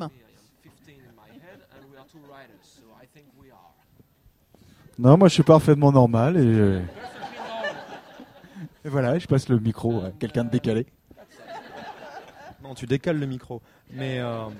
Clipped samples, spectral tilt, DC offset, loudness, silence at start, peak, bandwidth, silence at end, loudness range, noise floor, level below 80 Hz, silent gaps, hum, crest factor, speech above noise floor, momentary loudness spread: under 0.1%; -7.5 dB/octave; under 0.1%; -21 LUFS; 0 s; -2 dBFS; 14 kHz; 0 s; 12 LU; -60 dBFS; -54 dBFS; none; none; 22 dB; 38 dB; 26 LU